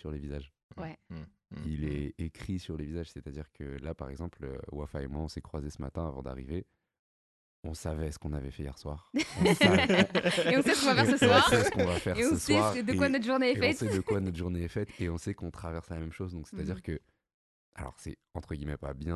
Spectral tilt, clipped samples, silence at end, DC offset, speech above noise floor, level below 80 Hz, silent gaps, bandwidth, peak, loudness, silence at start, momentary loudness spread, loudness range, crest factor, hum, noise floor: -5 dB/octave; under 0.1%; 0 s; under 0.1%; over 59 dB; -46 dBFS; 0.63-0.69 s, 6.99-7.63 s, 17.34-17.72 s; 12.5 kHz; -8 dBFS; -30 LUFS; 0.05 s; 19 LU; 16 LU; 24 dB; none; under -90 dBFS